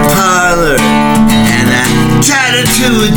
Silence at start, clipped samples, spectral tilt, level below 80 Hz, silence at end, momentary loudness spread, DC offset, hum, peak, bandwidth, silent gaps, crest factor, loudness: 0 s; under 0.1%; -4 dB/octave; -24 dBFS; 0 s; 1 LU; under 0.1%; none; 0 dBFS; over 20 kHz; none; 8 dB; -8 LUFS